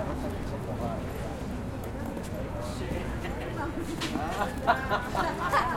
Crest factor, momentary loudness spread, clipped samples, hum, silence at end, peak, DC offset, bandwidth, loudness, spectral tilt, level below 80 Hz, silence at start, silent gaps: 22 dB; 9 LU; under 0.1%; none; 0 s; -10 dBFS; under 0.1%; 16.5 kHz; -32 LUFS; -5.5 dB/octave; -42 dBFS; 0 s; none